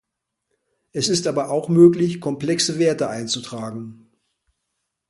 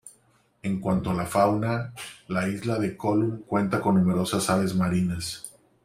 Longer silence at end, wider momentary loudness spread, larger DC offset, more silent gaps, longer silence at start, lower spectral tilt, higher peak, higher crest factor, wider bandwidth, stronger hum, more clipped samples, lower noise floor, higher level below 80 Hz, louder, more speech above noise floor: first, 1.15 s vs 0.35 s; first, 18 LU vs 11 LU; neither; neither; first, 0.95 s vs 0.05 s; about the same, -5 dB/octave vs -6 dB/octave; first, -2 dBFS vs -6 dBFS; about the same, 20 dB vs 20 dB; second, 11.5 kHz vs 15.5 kHz; neither; neither; first, -78 dBFS vs -63 dBFS; second, -62 dBFS vs -54 dBFS; first, -19 LUFS vs -26 LUFS; first, 59 dB vs 39 dB